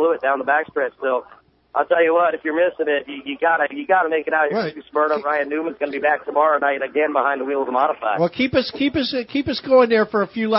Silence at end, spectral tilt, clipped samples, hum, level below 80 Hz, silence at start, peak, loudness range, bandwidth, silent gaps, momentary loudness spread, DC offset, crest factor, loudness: 0 s; -9 dB/octave; under 0.1%; none; -56 dBFS; 0 s; -2 dBFS; 1 LU; 5.8 kHz; none; 7 LU; under 0.1%; 16 dB; -20 LUFS